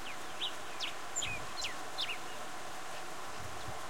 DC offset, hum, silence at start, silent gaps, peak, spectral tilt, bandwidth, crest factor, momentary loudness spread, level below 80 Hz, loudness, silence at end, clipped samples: 0.9%; none; 0 s; none; -24 dBFS; -1 dB/octave; 16.5 kHz; 18 dB; 7 LU; -64 dBFS; -40 LUFS; 0 s; under 0.1%